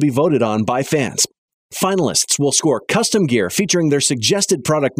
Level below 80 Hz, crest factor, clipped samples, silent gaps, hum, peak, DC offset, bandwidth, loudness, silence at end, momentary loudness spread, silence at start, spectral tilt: -58 dBFS; 14 dB; under 0.1%; 1.38-1.48 s, 1.54-1.69 s; none; -2 dBFS; under 0.1%; 16 kHz; -16 LUFS; 0.1 s; 4 LU; 0 s; -3.5 dB/octave